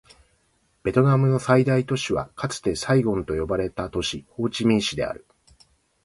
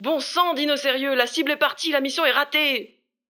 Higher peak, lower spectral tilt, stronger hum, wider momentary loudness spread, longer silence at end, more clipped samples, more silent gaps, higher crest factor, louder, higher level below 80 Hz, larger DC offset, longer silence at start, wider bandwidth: about the same, -4 dBFS vs -4 dBFS; first, -6 dB/octave vs -1 dB/octave; neither; first, 10 LU vs 3 LU; first, 0.85 s vs 0.45 s; neither; neither; about the same, 20 dB vs 20 dB; about the same, -23 LUFS vs -21 LUFS; first, -46 dBFS vs -84 dBFS; neither; first, 0.85 s vs 0 s; second, 11.5 kHz vs 20 kHz